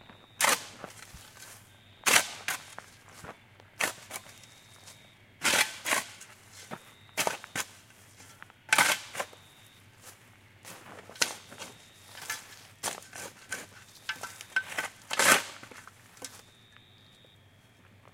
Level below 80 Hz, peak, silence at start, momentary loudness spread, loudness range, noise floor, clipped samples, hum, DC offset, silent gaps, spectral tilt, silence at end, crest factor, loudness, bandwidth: -70 dBFS; -4 dBFS; 0.4 s; 27 LU; 8 LU; -59 dBFS; under 0.1%; none; under 0.1%; none; 0 dB/octave; 1.75 s; 32 dB; -29 LUFS; 16.5 kHz